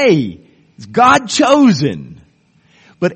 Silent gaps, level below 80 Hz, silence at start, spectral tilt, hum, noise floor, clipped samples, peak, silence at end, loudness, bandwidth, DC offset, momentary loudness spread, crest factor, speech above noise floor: none; -52 dBFS; 0 s; -5 dB/octave; none; -53 dBFS; under 0.1%; 0 dBFS; 0 s; -12 LUFS; 8.8 kHz; under 0.1%; 13 LU; 14 dB; 42 dB